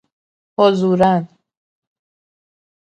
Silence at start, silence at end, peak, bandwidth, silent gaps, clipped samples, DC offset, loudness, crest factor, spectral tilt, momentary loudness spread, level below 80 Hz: 0.6 s; 1.7 s; 0 dBFS; 8.6 kHz; none; under 0.1%; under 0.1%; -15 LUFS; 20 dB; -7.5 dB/octave; 16 LU; -58 dBFS